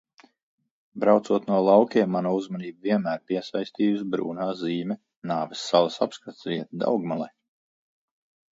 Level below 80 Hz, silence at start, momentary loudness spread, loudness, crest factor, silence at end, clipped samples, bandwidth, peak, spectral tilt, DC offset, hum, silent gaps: -72 dBFS; 0.95 s; 12 LU; -25 LUFS; 20 dB; 1.25 s; under 0.1%; 7.8 kHz; -4 dBFS; -6.5 dB/octave; under 0.1%; none; 5.16-5.22 s